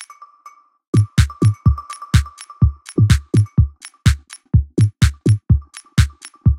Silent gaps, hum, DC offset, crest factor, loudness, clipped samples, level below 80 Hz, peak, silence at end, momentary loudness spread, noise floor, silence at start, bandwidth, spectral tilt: 0.88-0.93 s; none; under 0.1%; 16 dB; -18 LUFS; under 0.1%; -24 dBFS; 0 dBFS; 0 s; 5 LU; -46 dBFS; 0 s; 13.5 kHz; -6.5 dB/octave